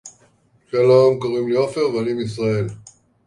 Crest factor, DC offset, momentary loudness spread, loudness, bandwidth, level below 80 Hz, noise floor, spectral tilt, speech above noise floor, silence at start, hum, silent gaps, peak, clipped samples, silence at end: 16 dB; under 0.1%; 11 LU; -19 LUFS; 11 kHz; -56 dBFS; -57 dBFS; -7 dB/octave; 40 dB; 0.05 s; none; none; -2 dBFS; under 0.1%; 0.45 s